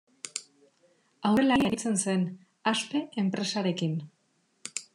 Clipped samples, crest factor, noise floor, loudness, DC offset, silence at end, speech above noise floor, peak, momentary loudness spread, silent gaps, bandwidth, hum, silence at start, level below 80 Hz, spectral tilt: under 0.1%; 18 dB; -71 dBFS; -29 LUFS; under 0.1%; 0.1 s; 44 dB; -12 dBFS; 14 LU; none; 12.5 kHz; none; 0.25 s; -64 dBFS; -4.5 dB/octave